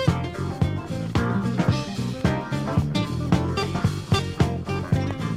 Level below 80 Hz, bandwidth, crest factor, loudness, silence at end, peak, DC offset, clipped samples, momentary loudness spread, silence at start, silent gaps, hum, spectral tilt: -38 dBFS; 14.5 kHz; 18 dB; -25 LUFS; 0 s; -6 dBFS; under 0.1%; under 0.1%; 4 LU; 0 s; none; none; -6.5 dB/octave